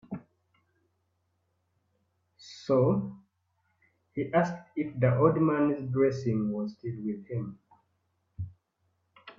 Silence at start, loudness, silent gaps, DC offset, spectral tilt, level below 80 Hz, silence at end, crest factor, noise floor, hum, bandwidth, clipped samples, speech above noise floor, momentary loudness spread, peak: 0.1 s; -29 LUFS; none; under 0.1%; -8.5 dB/octave; -66 dBFS; 0.05 s; 22 dB; -76 dBFS; none; 7.4 kHz; under 0.1%; 49 dB; 19 LU; -10 dBFS